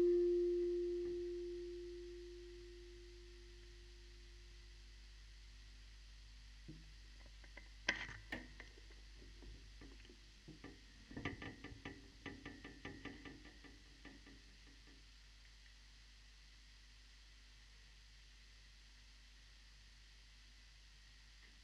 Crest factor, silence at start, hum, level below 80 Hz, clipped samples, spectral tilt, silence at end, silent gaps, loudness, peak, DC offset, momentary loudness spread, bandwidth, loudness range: 28 dB; 0 s; 50 Hz at -60 dBFS; -62 dBFS; under 0.1%; -5 dB/octave; 0 s; none; -47 LUFS; -20 dBFS; under 0.1%; 20 LU; 11 kHz; 13 LU